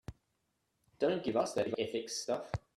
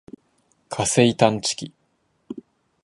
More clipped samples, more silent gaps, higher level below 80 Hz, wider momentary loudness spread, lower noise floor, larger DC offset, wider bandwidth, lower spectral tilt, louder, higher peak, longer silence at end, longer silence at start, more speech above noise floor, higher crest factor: neither; neither; about the same, -60 dBFS vs -58 dBFS; second, 5 LU vs 22 LU; first, -81 dBFS vs -68 dBFS; neither; first, 13.5 kHz vs 11.5 kHz; about the same, -4.5 dB/octave vs -4 dB/octave; second, -36 LUFS vs -20 LUFS; second, -18 dBFS vs -2 dBFS; second, 0.2 s vs 0.45 s; second, 0.1 s vs 0.7 s; about the same, 46 dB vs 48 dB; about the same, 20 dB vs 22 dB